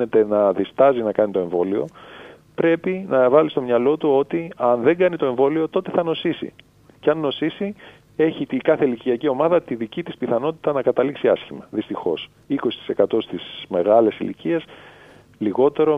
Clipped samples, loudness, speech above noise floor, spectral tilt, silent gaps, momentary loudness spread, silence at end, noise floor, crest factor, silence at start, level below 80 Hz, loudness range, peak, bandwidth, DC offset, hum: under 0.1%; -20 LUFS; 28 dB; -8 dB/octave; none; 12 LU; 0 s; -47 dBFS; 18 dB; 0 s; -64 dBFS; 4 LU; -2 dBFS; 5 kHz; under 0.1%; none